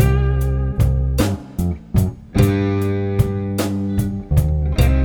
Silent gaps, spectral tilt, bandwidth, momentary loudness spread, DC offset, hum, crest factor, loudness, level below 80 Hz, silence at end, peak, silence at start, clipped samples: none; -7.5 dB/octave; 19.5 kHz; 5 LU; under 0.1%; none; 16 dB; -19 LUFS; -22 dBFS; 0 s; -2 dBFS; 0 s; under 0.1%